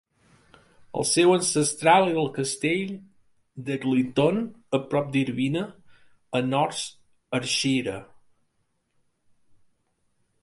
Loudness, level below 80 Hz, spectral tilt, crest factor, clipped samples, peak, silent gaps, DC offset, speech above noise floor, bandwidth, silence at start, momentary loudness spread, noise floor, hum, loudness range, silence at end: -24 LUFS; -64 dBFS; -4 dB/octave; 22 dB; under 0.1%; -4 dBFS; none; under 0.1%; 49 dB; 11.5 kHz; 0.95 s; 15 LU; -72 dBFS; none; 7 LU; 2.4 s